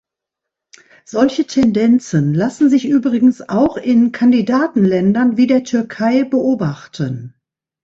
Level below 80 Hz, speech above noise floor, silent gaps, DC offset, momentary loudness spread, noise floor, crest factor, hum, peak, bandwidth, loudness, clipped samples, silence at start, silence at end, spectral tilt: -52 dBFS; 68 dB; none; under 0.1%; 9 LU; -82 dBFS; 14 dB; none; 0 dBFS; 7.8 kHz; -15 LUFS; under 0.1%; 1.15 s; 0.55 s; -7 dB/octave